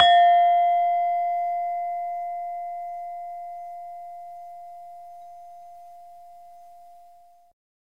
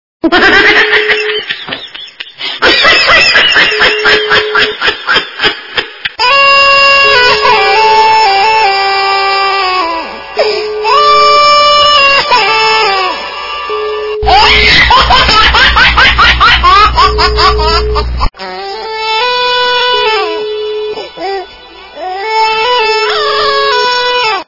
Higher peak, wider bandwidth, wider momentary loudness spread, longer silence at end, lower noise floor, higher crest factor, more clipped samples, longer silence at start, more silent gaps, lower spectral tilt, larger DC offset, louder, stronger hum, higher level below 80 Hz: about the same, -2 dBFS vs 0 dBFS; first, 7.4 kHz vs 6 kHz; first, 26 LU vs 14 LU; first, 1.3 s vs 0.05 s; first, -53 dBFS vs -31 dBFS; first, 22 dB vs 8 dB; second, under 0.1% vs 3%; second, 0 s vs 0.25 s; neither; second, -1.5 dB/octave vs -3 dB/octave; first, 0.2% vs under 0.1%; second, -23 LUFS vs -6 LUFS; neither; second, -70 dBFS vs -24 dBFS